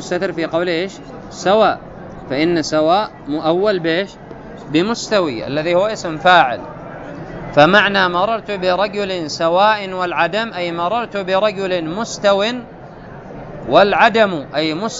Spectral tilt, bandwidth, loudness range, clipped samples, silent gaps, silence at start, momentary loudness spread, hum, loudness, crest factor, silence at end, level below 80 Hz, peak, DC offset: -4.5 dB/octave; 8 kHz; 3 LU; under 0.1%; none; 0 s; 20 LU; none; -16 LUFS; 16 dB; 0 s; -46 dBFS; 0 dBFS; under 0.1%